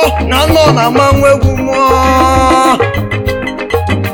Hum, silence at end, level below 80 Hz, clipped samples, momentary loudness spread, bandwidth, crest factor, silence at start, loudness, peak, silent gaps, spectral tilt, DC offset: none; 0 s; -22 dBFS; 0.8%; 8 LU; 19 kHz; 10 dB; 0 s; -9 LUFS; 0 dBFS; none; -5.5 dB/octave; under 0.1%